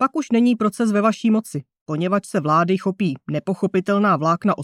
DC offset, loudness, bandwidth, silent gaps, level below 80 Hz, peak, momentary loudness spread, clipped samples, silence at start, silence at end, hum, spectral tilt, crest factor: under 0.1%; -20 LUFS; 13 kHz; 1.81-1.86 s; -68 dBFS; -4 dBFS; 7 LU; under 0.1%; 0 s; 0 s; none; -7 dB/octave; 14 dB